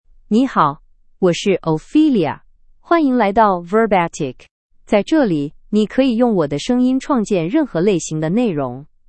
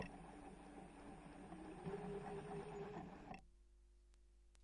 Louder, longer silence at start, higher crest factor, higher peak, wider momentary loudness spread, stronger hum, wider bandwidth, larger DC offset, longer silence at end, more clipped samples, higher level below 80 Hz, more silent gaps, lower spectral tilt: first, -17 LUFS vs -54 LUFS; first, 0.3 s vs 0 s; about the same, 16 dB vs 18 dB; first, 0 dBFS vs -36 dBFS; about the same, 8 LU vs 9 LU; second, none vs 50 Hz at -70 dBFS; second, 8.8 kHz vs 10.5 kHz; neither; first, 0.25 s vs 0 s; neither; first, -46 dBFS vs -68 dBFS; first, 4.51-4.69 s vs none; about the same, -6 dB/octave vs -6.5 dB/octave